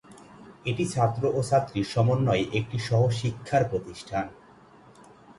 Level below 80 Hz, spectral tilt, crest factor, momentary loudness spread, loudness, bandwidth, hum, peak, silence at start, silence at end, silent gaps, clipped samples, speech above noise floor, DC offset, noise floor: -54 dBFS; -6.5 dB/octave; 18 dB; 9 LU; -26 LUFS; 11.5 kHz; none; -10 dBFS; 0.1 s; 1.05 s; none; under 0.1%; 27 dB; under 0.1%; -53 dBFS